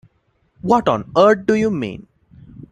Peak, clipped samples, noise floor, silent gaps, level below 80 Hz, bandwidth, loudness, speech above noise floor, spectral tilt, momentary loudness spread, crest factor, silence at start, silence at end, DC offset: -2 dBFS; under 0.1%; -63 dBFS; none; -52 dBFS; 9.2 kHz; -16 LUFS; 47 dB; -6.5 dB/octave; 15 LU; 18 dB; 0.65 s; 0.05 s; under 0.1%